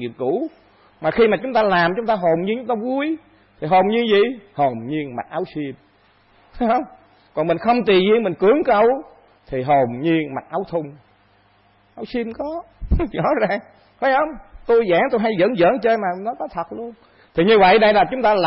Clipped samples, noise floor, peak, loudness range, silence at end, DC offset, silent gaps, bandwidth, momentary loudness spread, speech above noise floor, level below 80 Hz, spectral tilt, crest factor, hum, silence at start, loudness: under 0.1%; -56 dBFS; -4 dBFS; 7 LU; 0 s; under 0.1%; none; 5.8 kHz; 13 LU; 38 dB; -38 dBFS; -11 dB/octave; 14 dB; none; 0 s; -19 LUFS